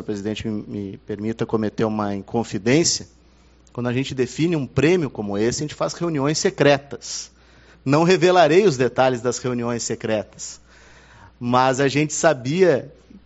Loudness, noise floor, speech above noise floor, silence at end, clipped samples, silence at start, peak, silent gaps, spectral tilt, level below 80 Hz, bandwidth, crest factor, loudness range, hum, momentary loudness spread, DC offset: -20 LUFS; -52 dBFS; 32 dB; 0.05 s; under 0.1%; 0 s; -2 dBFS; none; -5 dB/octave; -52 dBFS; 8 kHz; 18 dB; 4 LU; none; 14 LU; under 0.1%